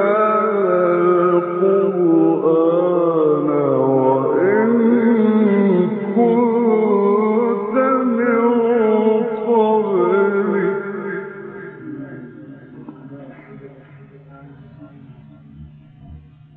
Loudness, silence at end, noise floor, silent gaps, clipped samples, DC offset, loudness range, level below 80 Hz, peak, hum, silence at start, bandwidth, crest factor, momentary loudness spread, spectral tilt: -16 LUFS; 0.35 s; -42 dBFS; none; under 0.1%; under 0.1%; 15 LU; -58 dBFS; -4 dBFS; none; 0 s; 3.9 kHz; 14 dB; 18 LU; -11.5 dB/octave